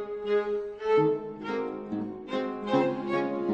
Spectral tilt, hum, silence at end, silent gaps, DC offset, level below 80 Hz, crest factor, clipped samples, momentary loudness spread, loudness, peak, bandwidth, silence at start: -7.5 dB/octave; none; 0 s; none; under 0.1%; -64 dBFS; 16 dB; under 0.1%; 9 LU; -29 LUFS; -12 dBFS; 7.2 kHz; 0 s